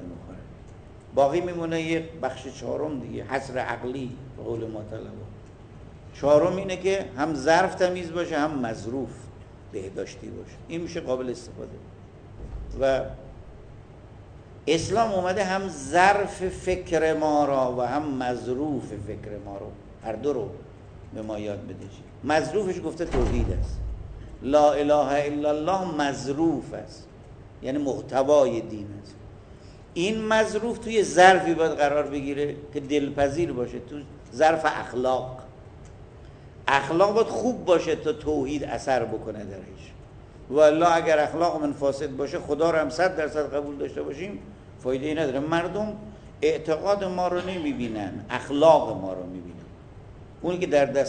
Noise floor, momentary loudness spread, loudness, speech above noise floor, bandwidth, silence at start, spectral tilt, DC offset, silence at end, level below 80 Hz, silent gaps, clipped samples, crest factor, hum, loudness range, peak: -46 dBFS; 20 LU; -25 LUFS; 21 dB; 9.4 kHz; 0 s; -5.5 dB/octave; under 0.1%; 0 s; -44 dBFS; none; under 0.1%; 24 dB; none; 9 LU; -2 dBFS